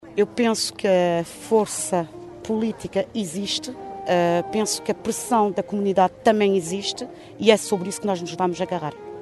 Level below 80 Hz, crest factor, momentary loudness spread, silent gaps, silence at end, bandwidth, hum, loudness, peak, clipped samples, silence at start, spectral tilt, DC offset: -60 dBFS; 20 dB; 9 LU; none; 0 s; 12 kHz; none; -23 LUFS; -2 dBFS; under 0.1%; 0.05 s; -4 dB/octave; under 0.1%